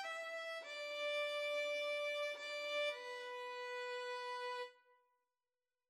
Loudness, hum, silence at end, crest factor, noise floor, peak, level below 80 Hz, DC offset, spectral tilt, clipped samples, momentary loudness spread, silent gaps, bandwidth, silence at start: -43 LUFS; none; 1.15 s; 14 dB; under -90 dBFS; -30 dBFS; under -90 dBFS; under 0.1%; 3 dB/octave; under 0.1%; 7 LU; none; 15 kHz; 0 s